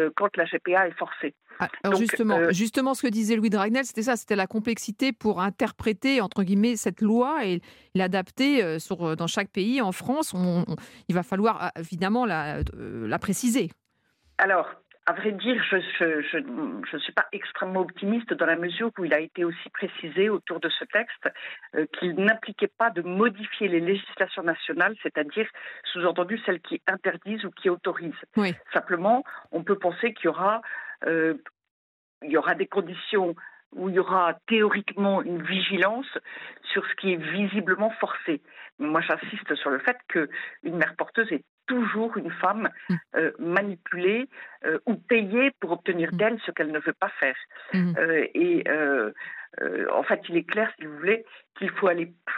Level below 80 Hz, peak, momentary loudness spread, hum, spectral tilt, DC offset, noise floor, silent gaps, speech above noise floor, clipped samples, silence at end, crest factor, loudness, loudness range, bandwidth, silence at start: -56 dBFS; -8 dBFS; 9 LU; none; -5 dB/octave; under 0.1%; -68 dBFS; 31.71-32.21 s, 33.66-33.71 s, 38.72-38.78 s, 41.49-41.58 s; 42 dB; under 0.1%; 0 s; 18 dB; -26 LUFS; 3 LU; 16 kHz; 0 s